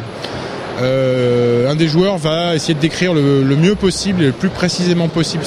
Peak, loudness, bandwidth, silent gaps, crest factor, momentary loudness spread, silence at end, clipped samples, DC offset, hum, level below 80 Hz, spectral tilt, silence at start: -2 dBFS; -15 LUFS; 12 kHz; none; 14 dB; 7 LU; 0 s; under 0.1%; under 0.1%; none; -42 dBFS; -6 dB/octave; 0 s